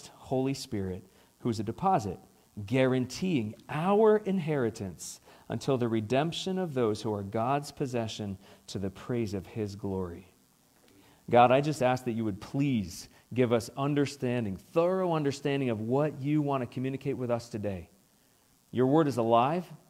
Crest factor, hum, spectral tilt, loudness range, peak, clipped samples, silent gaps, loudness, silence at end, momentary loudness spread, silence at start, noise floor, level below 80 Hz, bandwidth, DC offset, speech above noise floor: 22 dB; none; -6.5 dB/octave; 5 LU; -8 dBFS; under 0.1%; none; -30 LUFS; 0.15 s; 14 LU; 0.05 s; -65 dBFS; -66 dBFS; 16 kHz; under 0.1%; 36 dB